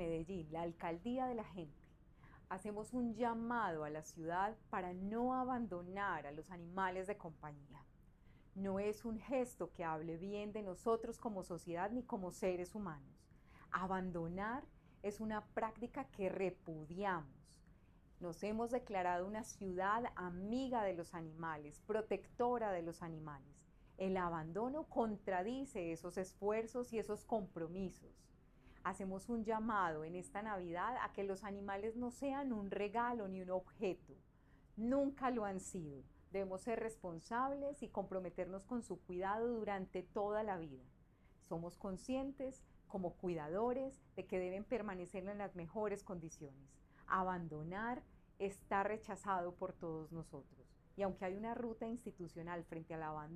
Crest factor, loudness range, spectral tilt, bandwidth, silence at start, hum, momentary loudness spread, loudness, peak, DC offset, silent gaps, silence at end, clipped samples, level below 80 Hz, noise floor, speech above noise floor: 20 dB; 3 LU; -6.5 dB/octave; 14 kHz; 0 s; none; 10 LU; -44 LUFS; -24 dBFS; under 0.1%; none; 0 s; under 0.1%; -66 dBFS; -68 dBFS; 25 dB